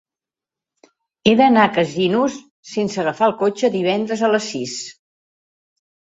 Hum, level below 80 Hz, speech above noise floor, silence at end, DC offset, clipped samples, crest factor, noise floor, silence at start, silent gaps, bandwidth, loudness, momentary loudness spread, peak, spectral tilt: none; -58 dBFS; 72 dB; 1.2 s; under 0.1%; under 0.1%; 18 dB; -89 dBFS; 1.25 s; 2.51-2.63 s; 8 kHz; -18 LUFS; 14 LU; -2 dBFS; -5 dB/octave